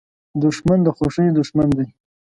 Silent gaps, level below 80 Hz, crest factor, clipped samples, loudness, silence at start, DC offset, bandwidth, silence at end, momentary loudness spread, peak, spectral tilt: none; -44 dBFS; 14 dB; under 0.1%; -18 LUFS; 0.35 s; under 0.1%; 11 kHz; 0.35 s; 7 LU; -4 dBFS; -8 dB/octave